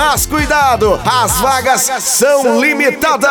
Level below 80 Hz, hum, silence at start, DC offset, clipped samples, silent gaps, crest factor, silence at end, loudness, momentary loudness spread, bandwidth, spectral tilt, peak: -30 dBFS; none; 0 s; under 0.1%; under 0.1%; none; 10 dB; 0 s; -11 LUFS; 2 LU; over 20 kHz; -2.5 dB/octave; 0 dBFS